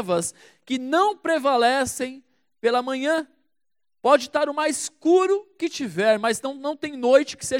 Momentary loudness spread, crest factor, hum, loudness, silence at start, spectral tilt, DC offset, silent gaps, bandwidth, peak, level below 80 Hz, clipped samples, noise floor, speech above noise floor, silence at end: 10 LU; 18 dB; none; -22 LUFS; 0 s; -3.5 dB/octave; under 0.1%; none; 16.5 kHz; -4 dBFS; -66 dBFS; under 0.1%; -87 dBFS; 65 dB; 0 s